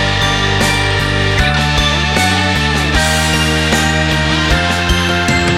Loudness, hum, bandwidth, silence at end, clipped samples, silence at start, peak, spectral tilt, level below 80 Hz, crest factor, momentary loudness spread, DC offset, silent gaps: -12 LUFS; none; 16.5 kHz; 0 s; under 0.1%; 0 s; 0 dBFS; -4 dB/octave; -22 dBFS; 12 dB; 1 LU; under 0.1%; none